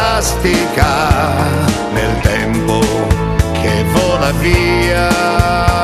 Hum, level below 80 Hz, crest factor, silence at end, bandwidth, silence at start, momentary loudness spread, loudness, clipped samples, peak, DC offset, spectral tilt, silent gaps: none; -22 dBFS; 12 dB; 0 s; 14 kHz; 0 s; 3 LU; -13 LUFS; under 0.1%; 0 dBFS; under 0.1%; -5 dB/octave; none